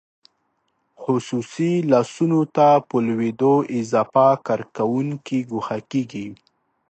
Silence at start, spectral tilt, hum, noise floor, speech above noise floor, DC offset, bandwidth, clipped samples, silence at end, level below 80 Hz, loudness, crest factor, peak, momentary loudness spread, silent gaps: 1 s; -7.5 dB/octave; none; -70 dBFS; 50 dB; under 0.1%; 8.8 kHz; under 0.1%; 0.55 s; -68 dBFS; -20 LUFS; 18 dB; -2 dBFS; 10 LU; none